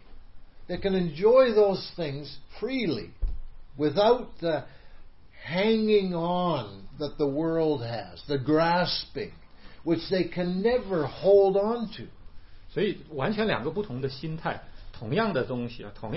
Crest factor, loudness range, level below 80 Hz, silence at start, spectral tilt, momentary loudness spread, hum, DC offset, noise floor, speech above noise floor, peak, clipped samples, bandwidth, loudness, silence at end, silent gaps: 18 dB; 4 LU; -44 dBFS; 0.1 s; -10 dB/octave; 16 LU; none; 0.3%; -46 dBFS; 20 dB; -8 dBFS; under 0.1%; 5.8 kHz; -27 LUFS; 0 s; none